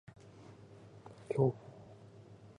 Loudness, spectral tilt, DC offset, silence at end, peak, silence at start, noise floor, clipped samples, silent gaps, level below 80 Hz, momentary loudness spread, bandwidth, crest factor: -35 LUFS; -9.5 dB/octave; under 0.1%; 0.1 s; -18 dBFS; 0.5 s; -56 dBFS; under 0.1%; none; -72 dBFS; 24 LU; 10.5 kHz; 24 dB